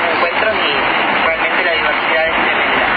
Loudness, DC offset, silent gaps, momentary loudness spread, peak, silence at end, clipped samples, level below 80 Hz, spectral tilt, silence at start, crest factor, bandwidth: -13 LUFS; under 0.1%; none; 1 LU; 0 dBFS; 0 s; under 0.1%; -44 dBFS; -6.5 dB/octave; 0 s; 14 dB; 5 kHz